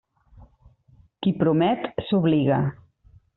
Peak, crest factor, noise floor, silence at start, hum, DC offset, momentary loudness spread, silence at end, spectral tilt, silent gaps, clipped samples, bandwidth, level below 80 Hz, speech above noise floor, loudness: -8 dBFS; 16 dB; -57 dBFS; 0.4 s; none; under 0.1%; 7 LU; 0.65 s; -7 dB/octave; none; under 0.1%; 4.2 kHz; -56 dBFS; 36 dB; -23 LUFS